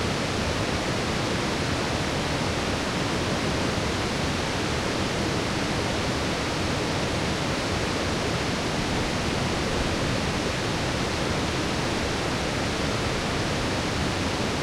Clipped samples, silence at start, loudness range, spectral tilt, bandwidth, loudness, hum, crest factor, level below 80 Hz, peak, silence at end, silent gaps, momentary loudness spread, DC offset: under 0.1%; 0 s; 0 LU; -4.5 dB/octave; 16.5 kHz; -26 LUFS; none; 14 dB; -40 dBFS; -12 dBFS; 0 s; none; 1 LU; under 0.1%